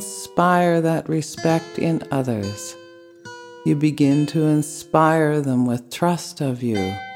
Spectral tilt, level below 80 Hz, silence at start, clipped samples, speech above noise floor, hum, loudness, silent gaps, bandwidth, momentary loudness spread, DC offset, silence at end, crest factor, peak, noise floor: -6 dB/octave; -62 dBFS; 0 s; under 0.1%; 22 dB; none; -20 LUFS; none; 16.5 kHz; 10 LU; under 0.1%; 0 s; 18 dB; -2 dBFS; -42 dBFS